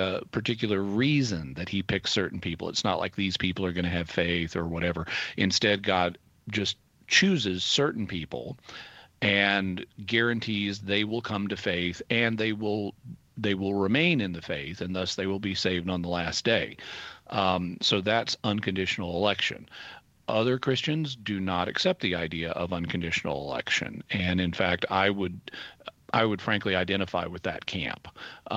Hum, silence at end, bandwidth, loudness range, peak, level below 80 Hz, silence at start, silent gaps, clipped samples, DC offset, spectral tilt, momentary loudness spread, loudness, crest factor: none; 0 s; 8.4 kHz; 3 LU; -8 dBFS; -56 dBFS; 0 s; none; under 0.1%; under 0.1%; -4.5 dB/octave; 12 LU; -28 LUFS; 22 dB